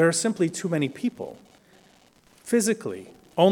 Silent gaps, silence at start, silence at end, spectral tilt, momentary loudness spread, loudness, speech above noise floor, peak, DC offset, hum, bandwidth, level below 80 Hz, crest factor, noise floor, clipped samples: none; 0 s; 0 s; -4.5 dB/octave; 17 LU; -26 LUFS; 33 dB; -6 dBFS; under 0.1%; none; 18 kHz; -70 dBFS; 20 dB; -58 dBFS; under 0.1%